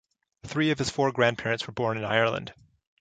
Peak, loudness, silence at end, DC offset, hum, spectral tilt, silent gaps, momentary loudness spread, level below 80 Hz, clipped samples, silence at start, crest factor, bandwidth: -6 dBFS; -27 LUFS; 0.5 s; under 0.1%; none; -5 dB/octave; none; 9 LU; -60 dBFS; under 0.1%; 0.45 s; 22 dB; 9.4 kHz